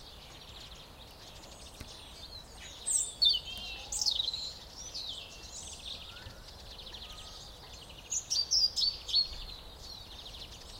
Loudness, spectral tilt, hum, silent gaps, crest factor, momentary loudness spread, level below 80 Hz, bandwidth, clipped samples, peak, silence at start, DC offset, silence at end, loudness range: -31 LUFS; 0 dB/octave; none; none; 22 dB; 22 LU; -54 dBFS; 16 kHz; under 0.1%; -16 dBFS; 0 s; under 0.1%; 0 s; 11 LU